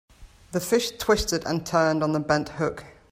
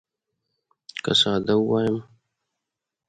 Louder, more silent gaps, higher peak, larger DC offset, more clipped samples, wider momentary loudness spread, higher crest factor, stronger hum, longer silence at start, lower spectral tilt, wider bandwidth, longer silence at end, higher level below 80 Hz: second, -25 LUFS vs -22 LUFS; neither; about the same, -8 dBFS vs -6 dBFS; neither; neither; second, 8 LU vs 13 LU; about the same, 18 dB vs 20 dB; neither; second, 0.2 s vs 0.95 s; about the same, -4.5 dB/octave vs -5 dB/octave; first, 16 kHz vs 11 kHz; second, 0.2 s vs 1.05 s; first, -46 dBFS vs -60 dBFS